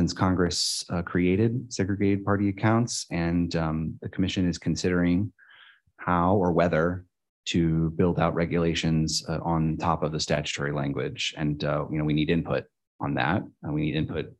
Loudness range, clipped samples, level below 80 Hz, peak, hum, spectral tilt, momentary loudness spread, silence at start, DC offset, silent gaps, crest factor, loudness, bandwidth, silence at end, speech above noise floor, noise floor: 3 LU; under 0.1%; -46 dBFS; -8 dBFS; none; -5.5 dB/octave; 6 LU; 0 s; under 0.1%; 7.29-7.43 s, 12.87-12.99 s; 18 dB; -26 LUFS; 12 kHz; 0.05 s; 30 dB; -55 dBFS